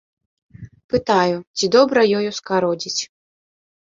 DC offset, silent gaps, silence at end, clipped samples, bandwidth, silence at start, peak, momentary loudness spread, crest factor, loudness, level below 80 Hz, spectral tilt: under 0.1%; 0.84-0.89 s, 1.47-1.54 s; 0.9 s; under 0.1%; 7.8 kHz; 0.6 s; -2 dBFS; 9 LU; 20 dB; -18 LUFS; -54 dBFS; -4 dB/octave